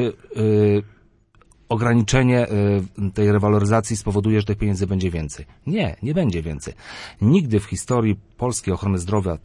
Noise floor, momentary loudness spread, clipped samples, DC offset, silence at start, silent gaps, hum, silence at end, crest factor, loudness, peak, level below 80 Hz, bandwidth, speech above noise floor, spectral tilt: -55 dBFS; 10 LU; under 0.1%; under 0.1%; 0 s; none; none; 0.05 s; 18 dB; -20 LUFS; -2 dBFS; -42 dBFS; 11.5 kHz; 35 dB; -6.5 dB/octave